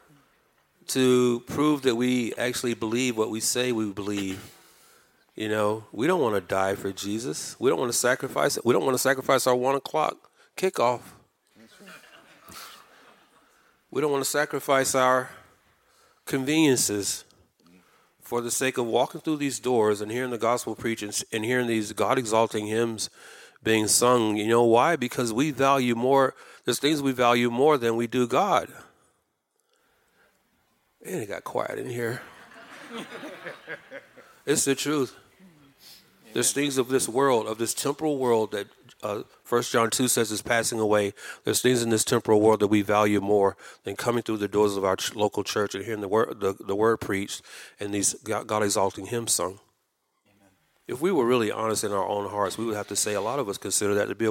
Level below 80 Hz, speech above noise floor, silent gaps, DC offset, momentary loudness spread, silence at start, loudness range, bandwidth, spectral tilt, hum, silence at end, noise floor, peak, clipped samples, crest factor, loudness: -68 dBFS; 50 dB; none; under 0.1%; 13 LU; 0.9 s; 9 LU; 17 kHz; -3.5 dB/octave; none; 0 s; -75 dBFS; -6 dBFS; under 0.1%; 20 dB; -25 LUFS